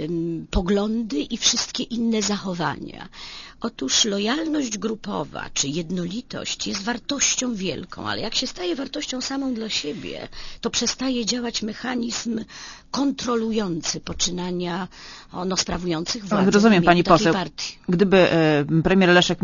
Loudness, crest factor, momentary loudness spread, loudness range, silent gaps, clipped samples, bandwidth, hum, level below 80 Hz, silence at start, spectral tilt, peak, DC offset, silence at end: -22 LUFS; 22 dB; 15 LU; 7 LU; none; under 0.1%; 7.4 kHz; none; -42 dBFS; 0 s; -4 dB/octave; 0 dBFS; under 0.1%; 0 s